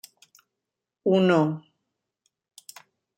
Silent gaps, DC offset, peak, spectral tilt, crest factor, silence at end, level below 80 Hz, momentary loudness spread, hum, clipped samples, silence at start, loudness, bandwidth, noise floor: none; under 0.1%; -8 dBFS; -7 dB/octave; 20 dB; 1.6 s; -72 dBFS; 26 LU; none; under 0.1%; 1.05 s; -23 LUFS; 16.5 kHz; -86 dBFS